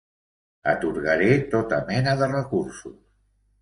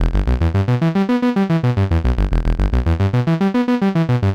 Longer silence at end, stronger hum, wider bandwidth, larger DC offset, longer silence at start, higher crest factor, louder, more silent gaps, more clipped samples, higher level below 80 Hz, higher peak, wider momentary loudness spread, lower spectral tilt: first, 0.7 s vs 0 s; neither; first, 11 kHz vs 8.8 kHz; neither; first, 0.65 s vs 0 s; first, 20 dB vs 10 dB; second, -23 LUFS vs -17 LUFS; neither; neither; second, -52 dBFS vs -22 dBFS; about the same, -6 dBFS vs -6 dBFS; first, 13 LU vs 2 LU; second, -6.5 dB/octave vs -8.5 dB/octave